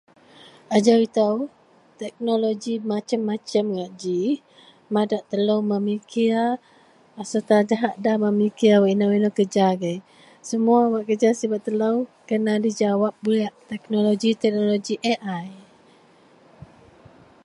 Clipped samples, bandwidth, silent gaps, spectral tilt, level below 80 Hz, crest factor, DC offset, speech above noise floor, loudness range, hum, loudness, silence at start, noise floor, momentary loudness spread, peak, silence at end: under 0.1%; 11 kHz; none; -6 dB/octave; -70 dBFS; 20 dB; under 0.1%; 33 dB; 5 LU; none; -22 LUFS; 0.7 s; -54 dBFS; 11 LU; -4 dBFS; 1.85 s